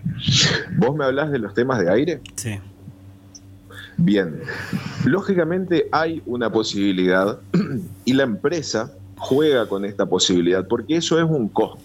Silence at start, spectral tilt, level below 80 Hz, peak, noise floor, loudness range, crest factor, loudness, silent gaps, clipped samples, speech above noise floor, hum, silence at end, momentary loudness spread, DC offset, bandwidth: 0 s; -5 dB/octave; -52 dBFS; -4 dBFS; -44 dBFS; 4 LU; 16 dB; -20 LUFS; none; under 0.1%; 24 dB; 50 Hz at -45 dBFS; 0.05 s; 10 LU; under 0.1%; 16 kHz